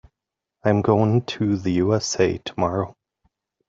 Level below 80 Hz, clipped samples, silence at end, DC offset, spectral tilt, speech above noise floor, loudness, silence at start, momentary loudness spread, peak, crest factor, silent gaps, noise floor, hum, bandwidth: -56 dBFS; under 0.1%; 0.75 s; under 0.1%; -6 dB/octave; 65 dB; -22 LUFS; 0.65 s; 7 LU; -4 dBFS; 20 dB; none; -85 dBFS; none; 7.8 kHz